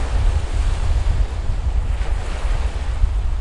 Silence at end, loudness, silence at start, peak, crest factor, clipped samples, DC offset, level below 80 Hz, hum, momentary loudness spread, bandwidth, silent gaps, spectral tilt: 0 s; -23 LUFS; 0 s; -6 dBFS; 14 dB; under 0.1%; under 0.1%; -18 dBFS; none; 3 LU; 10.5 kHz; none; -6 dB/octave